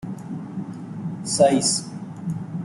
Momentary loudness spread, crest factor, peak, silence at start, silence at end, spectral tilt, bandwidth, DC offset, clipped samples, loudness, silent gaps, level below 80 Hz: 16 LU; 20 dB; -4 dBFS; 0 s; 0 s; -4.5 dB/octave; 12 kHz; under 0.1%; under 0.1%; -23 LUFS; none; -60 dBFS